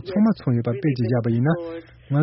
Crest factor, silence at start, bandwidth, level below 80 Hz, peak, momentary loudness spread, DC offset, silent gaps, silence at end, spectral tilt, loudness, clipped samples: 14 dB; 0 s; 5.8 kHz; -54 dBFS; -8 dBFS; 8 LU; under 0.1%; none; 0 s; -8.5 dB/octave; -22 LUFS; under 0.1%